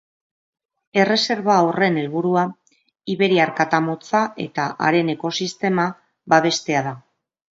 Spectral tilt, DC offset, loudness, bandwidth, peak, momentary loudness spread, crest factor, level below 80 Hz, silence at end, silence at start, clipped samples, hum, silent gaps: -5 dB/octave; under 0.1%; -20 LUFS; 8 kHz; -2 dBFS; 8 LU; 20 dB; -68 dBFS; 0.55 s; 0.95 s; under 0.1%; none; none